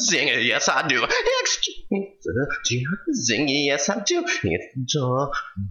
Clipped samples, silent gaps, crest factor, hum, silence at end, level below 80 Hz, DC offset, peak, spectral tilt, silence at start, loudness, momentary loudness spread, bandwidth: under 0.1%; none; 18 dB; none; 0 s; -50 dBFS; under 0.1%; -4 dBFS; -3 dB/octave; 0 s; -22 LUFS; 9 LU; 10.5 kHz